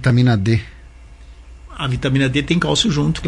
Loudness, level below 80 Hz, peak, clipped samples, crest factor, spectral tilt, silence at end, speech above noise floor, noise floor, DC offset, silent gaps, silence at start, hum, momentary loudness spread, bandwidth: -17 LUFS; -36 dBFS; -4 dBFS; under 0.1%; 14 dB; -5.5 dB/octave; 0 s; 24 dB; -40 dBFS; under 0.1%; none; 0 s; none; 11 LU; 11 kHz